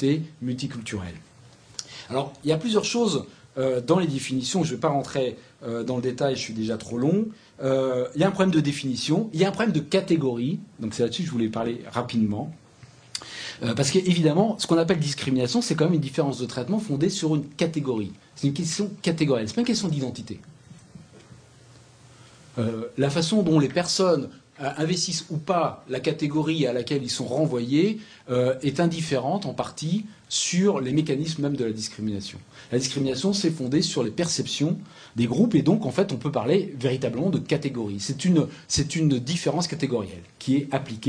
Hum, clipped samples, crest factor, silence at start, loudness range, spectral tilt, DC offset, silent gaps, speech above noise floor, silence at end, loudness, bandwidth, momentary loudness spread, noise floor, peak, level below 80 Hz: none; under 0.1%; 18 dB; 0 s; 4 LU; -5.5 dB/octave; under 0.1%; none; 27 dB; 0 s; -25 LUFS; 10.5 kHz; 10 LU; -51 dBFS; -6 dBFS; -58 dBFS